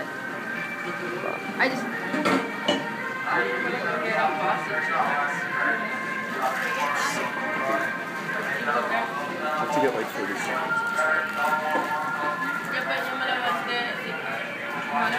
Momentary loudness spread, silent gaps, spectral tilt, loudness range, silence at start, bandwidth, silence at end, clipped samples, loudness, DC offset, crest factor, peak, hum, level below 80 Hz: 6 LU; none; -3.5 dB/octave; 1 LU; 0 s; 15.5 kHz; 0 s; under 0.1%; -26 LUFS; under 0.1%; 18 dB; -10 dBFS; none; -76 dBFS